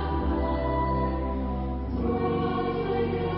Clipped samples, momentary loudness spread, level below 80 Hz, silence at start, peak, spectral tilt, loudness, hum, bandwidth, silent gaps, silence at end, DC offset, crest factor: under 0.1%; 4 LU; -34 dBFS; 0 s; -14 dBFS; -12 dB/octave; -28 LUFS; none; 5.4 kHz; none; 0 s; under 0.1%; 12 dB